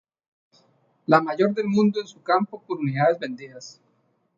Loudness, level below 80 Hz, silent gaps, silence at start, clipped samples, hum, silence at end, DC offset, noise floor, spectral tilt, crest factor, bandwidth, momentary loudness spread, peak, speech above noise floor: -23 LUFS; -72 dBFS; none; 1.1 s; under 0.1%; none; 0.65 s; under 0.1%; -67 dBFS; -7 dB/octave; 22 dB; 7.6 kHz; 17 LU; -2 dBFS; 45 dB